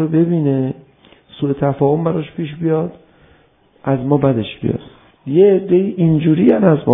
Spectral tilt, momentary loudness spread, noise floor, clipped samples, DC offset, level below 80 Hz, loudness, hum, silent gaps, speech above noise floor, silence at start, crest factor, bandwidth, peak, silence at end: -12.5 dB/octave; 13 LU; -53 dBFS; under 0.1%; under 0.1%; -50 dBFS; -16 LUFS; none; none; 38 dB; 0 s; 16 dB; 3.8 kHz; 0 dBFS; 0 s